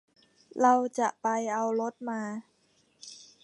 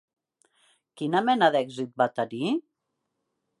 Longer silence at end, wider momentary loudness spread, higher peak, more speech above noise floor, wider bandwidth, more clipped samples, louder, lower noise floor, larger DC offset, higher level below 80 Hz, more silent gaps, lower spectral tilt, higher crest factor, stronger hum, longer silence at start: second, 0.2 s vs 1 s; first, 22 LU vs 11 LU; about the same, -10 dBFS vs -8 dBFS; second, 40 dB vs 56 dB; about the same, 11 kHz vs 11.5 kHz; neither; second, -29 LUFS vs -26 LUFS; second, -68 dBFS vs -80 dBFS; neither; about the same, -86 dBFS vs -82 dBFS; neither; second, -4.5 dB/octave vs -6 dB/octave; about the same, 20 dB vs 20 dB; neither; second, 0.55 s vs 0.95 s